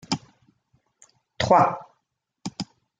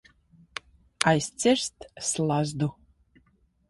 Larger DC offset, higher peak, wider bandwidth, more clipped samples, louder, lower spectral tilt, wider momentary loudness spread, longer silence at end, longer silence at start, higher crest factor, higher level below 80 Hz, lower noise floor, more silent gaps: neither; second, -4 dBFS vs 0 dBFS; second, 9.4 kHz vs 11.5 kHz; neither; first, -23 LUFS vs -26 LUFS; about the same, -5 dB/octave vs -4 dB/octave; about the same, 19 LU vs 17 LU; second, 0.35 s vs 1 s; second, 0.1 s vs 1 s; second, 22 dB vs 28 dB; about the same, -58 dBFS vs -60 dBFS; first, -77 dBFS vs -66 dBFS; neither